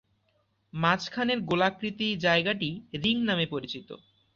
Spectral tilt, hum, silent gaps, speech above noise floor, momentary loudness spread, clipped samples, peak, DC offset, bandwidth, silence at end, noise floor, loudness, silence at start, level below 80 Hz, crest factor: -5.5 dB/octave; none; none; 43 dB; 15 LU; under 0.1%; -10 dBFS; under 0.1%; 7.4 kHz; 0.4 s; -72 dBFS; -27 LUFS; 0.75 s; -64 dBFS; 20 dB